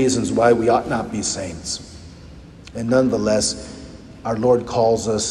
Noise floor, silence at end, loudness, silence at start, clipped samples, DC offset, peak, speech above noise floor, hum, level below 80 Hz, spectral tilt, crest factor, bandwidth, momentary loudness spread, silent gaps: -40 dBFS; 0 s; -19 LUFS; 0 s; under 0.1%; under 0.1%; -2 dBFS; 21 dB; none; -44 dBFS; -4.5 dB/octave; 18 dB; 12 kHz; 19 LU; none